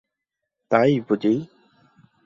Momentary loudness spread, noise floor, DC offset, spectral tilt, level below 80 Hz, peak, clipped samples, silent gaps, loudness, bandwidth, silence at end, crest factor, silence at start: 8 LU; -83 dBFS; under 0.1%; -8 dB/octave; -66 dBFS; -2 dBFS; under 0.1%; none; -21 LUFS; 7.4 kHz; 0.8 s; 22 dB; 0.7 s